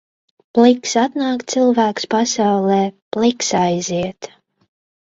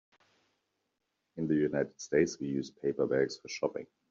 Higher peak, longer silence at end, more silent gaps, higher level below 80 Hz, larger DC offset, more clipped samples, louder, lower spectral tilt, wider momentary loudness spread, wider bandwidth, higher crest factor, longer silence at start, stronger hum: first, 0 dBFS vs -14 dBFS; first, 0.75 s vs 0.25 s; first, 3.02-3.11 s vs none; first, -58 dBFS vs -70 dBFS; neither; neither; first, -17 LUFS vs -33 LUFS; about the same, -4.5 dB/octave vs -5.5 dB/octave; about the same, 9 LU vs 7 LU; about the same, 7.8 kHz vs 7.6 kHz; about the same, 18 dB vs 20 dB; second, 0.55 s vs 1.35 s; neither